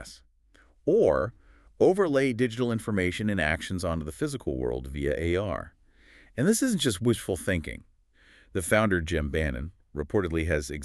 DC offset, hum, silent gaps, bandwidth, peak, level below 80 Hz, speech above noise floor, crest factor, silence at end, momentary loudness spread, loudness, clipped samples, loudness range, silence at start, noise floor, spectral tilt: under 0.1%; none; none; 13.5 kHz; -8 dBFS; -42 dBFS; 34 dB; 20 dB; 0 s; 12 LU; -27 LUFS; under 0.1%; 3 LU; 0 s; -60 dBFS; -5.5 dB/octave